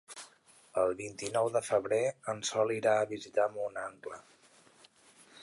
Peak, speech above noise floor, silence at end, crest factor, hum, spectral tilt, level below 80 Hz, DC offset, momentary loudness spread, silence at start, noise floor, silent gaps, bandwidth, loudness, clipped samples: -16 dBFS; 30 dB; 0 s; 18 dB; none; -3.5 dB/octave; -74 dBFS; under 0.1%; 17 LU; 0.1 s; -62 dBFS; none; 11.5 kHz; -32 LUFS; under 0.1%